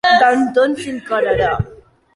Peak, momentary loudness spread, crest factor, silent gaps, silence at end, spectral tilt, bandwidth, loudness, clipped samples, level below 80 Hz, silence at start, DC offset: -2 dBFS; 12 LU; 14 dB; none; 0.4 s; -5.5 dB/octave; 11.5 kHz; -16 LUFS; under 0.1%; -40 dBFS; 0.05 s; under 0.1%